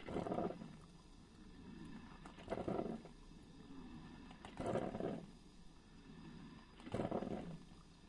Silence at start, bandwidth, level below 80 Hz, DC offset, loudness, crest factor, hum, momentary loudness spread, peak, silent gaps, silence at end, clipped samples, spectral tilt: 0 s; 11 kHz; -64 dBFS; under 0.1%; -48 LUFS; 20 dB; none; 19 LU; -28 dBFS; none; 0 s; under 0.1%; -7 dB/octave